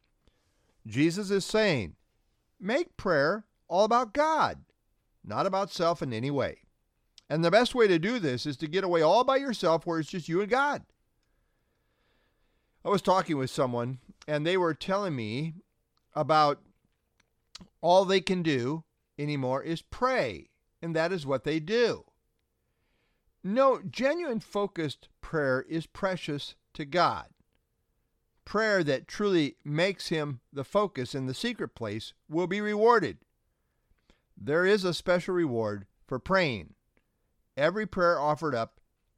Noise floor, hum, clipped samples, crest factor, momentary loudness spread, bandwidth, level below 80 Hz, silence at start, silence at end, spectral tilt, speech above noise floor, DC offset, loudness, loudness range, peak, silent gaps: -77 dBFS; none; under 0.1%; 22 dB; 13 LU; 14.5 kHz; -60 dBFS; 0.85 s; 0.5 s; -5.5 dB/octave; 49 dB; under 0.1%; -28 LUFS; 4 LU; -8 dBFS; none